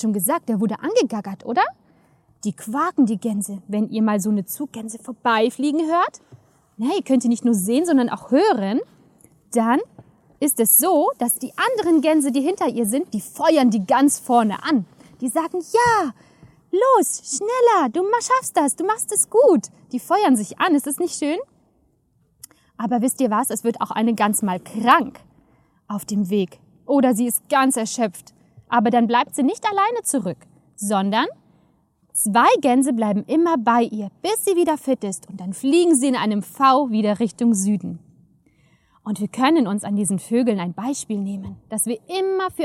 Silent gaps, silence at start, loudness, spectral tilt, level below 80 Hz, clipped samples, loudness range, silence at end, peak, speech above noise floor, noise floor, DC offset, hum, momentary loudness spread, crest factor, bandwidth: none; 0 s; -20 LUFS; -4 dB/octave; -66 dBFS; under 0.1%; 4 LU; 0 s; -2 dBFS; 44 dB; -63 dBFS; under 0.1%; none; 11 LU; 18 dB; 16.5 kHz